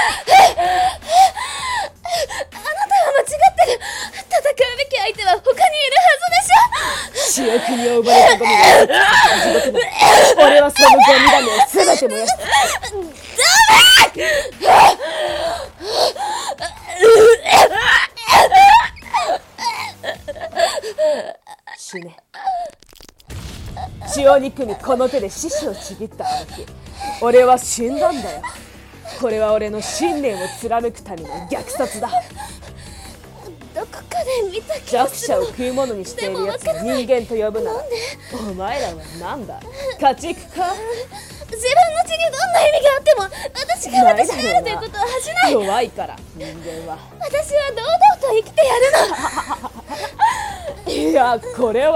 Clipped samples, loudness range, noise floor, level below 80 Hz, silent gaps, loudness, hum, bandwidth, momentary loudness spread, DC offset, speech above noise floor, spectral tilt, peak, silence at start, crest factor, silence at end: under 0.1%; 13 LU; -44 dBFS; -44 dBFS; none; -14 LUFS; none; 18 kHz; 20 LU; under 0.1%; 26 dB; -2 dB/octave; 0 dBFS; 0 s; 16 dB; 0 s